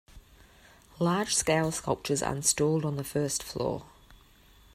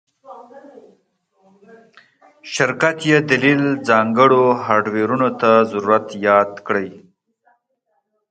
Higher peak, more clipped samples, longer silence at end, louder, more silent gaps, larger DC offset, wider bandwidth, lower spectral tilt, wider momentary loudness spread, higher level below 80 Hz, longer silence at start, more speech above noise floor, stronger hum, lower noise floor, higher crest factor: second, -12 dBFS vs 0 dBFS; neither; second, 0.6 s vs 1.3 s; second, -28 LUFS vs -16 LUFS; neither; neither; first, 16 kHz vs 9.2 kHz; second, -4 dB/octave vs -5.5 dB/octave; about the same, 8 LU vs 8 LU; first, -56 dBFS vs -62 dBFS; second, 0.15 s vs 0.3 s; second, 29 dB vs 54 dB; neither; second, -58 dBFS vs -70 dBFS; about the same, 20 dB vs 18 dB